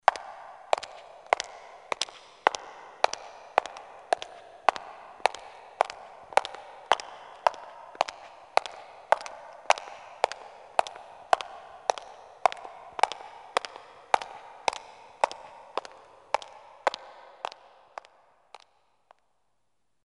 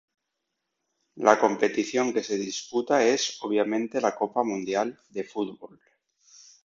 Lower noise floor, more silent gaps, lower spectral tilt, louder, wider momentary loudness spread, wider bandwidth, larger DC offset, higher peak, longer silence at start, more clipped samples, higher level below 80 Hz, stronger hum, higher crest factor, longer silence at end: about the same, -80 dBFS vs -82 dBFS; neither; second, 0 dB/octave vs -3.5 dB/octave; second, -31 LUFS vs -26 LUFS; first, 18 LU vs 11 LU; first, 11.5 kHz vs 7.8 kHz; neither; about the same, -2 dBFS vs -2 dBFS; second, 0.1 s vs 1.15 s; neither; about the same, -74 dBFS vs -72 dBFS; neither; first, 30 dB vs 24 dB; first, 2.95 s vs 1 s